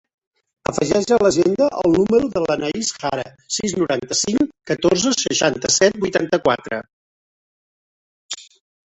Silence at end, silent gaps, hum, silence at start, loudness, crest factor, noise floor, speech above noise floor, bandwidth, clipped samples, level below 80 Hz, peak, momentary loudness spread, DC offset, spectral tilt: 0.4 s; 6.93-8.29 s; none; 0.7 s; -18 LUFS; 18 dB; under -90 dBFS; over 72 dB; 8.4 kHz; under 0.1%; -52 dBFS; -2 dBFS; 13 LU; under 0.1%; -3.5 dB/octave